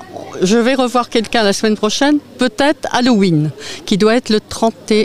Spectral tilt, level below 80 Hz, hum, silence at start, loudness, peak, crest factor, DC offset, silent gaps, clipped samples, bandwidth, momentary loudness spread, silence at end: -4.5 dB/octave; -46 dBFS; none; 0 s; -14 LUFS; 0 dBFS; 14 dB; 2%; none; under 0.1%; 15 kHz; 6 LU; 0 s